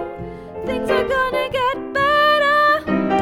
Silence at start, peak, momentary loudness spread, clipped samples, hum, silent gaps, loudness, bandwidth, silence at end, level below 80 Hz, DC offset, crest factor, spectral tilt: 0 s; -6 dBFS; 15 LU; under 0.1%; none; none; -17 LUFS; 17 kHz; 0 s; -44 dBFS; under 0.1%; 14 dB; -5 dB/octave